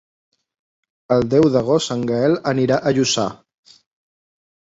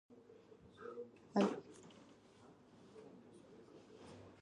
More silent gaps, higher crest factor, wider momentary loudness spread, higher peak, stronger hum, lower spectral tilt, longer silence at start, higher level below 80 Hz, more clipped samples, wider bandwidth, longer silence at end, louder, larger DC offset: neither; second, 18 dB vs 24 dB; second, 6 LU vs 26 LU; first, -2 dBFS vs -22 dBFS; neither; second, -5 dB/octave vs -6.5 dB/octave; first, 1.1 s vs 0.1 s; first, -52 dBFS vs -82 dBFS; neither; second, 8 kHz vs 10.5 kHz; first, 1.3 s vs 0 s; first, -18 LUFS vs -42 LUFS; neither